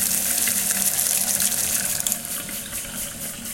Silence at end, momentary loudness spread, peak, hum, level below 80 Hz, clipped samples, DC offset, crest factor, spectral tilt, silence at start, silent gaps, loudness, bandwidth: 0 s; 10 LU; 0 dBFS; none; -52 dBFS; under 0.1%; under 0.1%; 24 dB; 0 dB/octave; 0 s; none; -21 LUFS; 17.5 kHz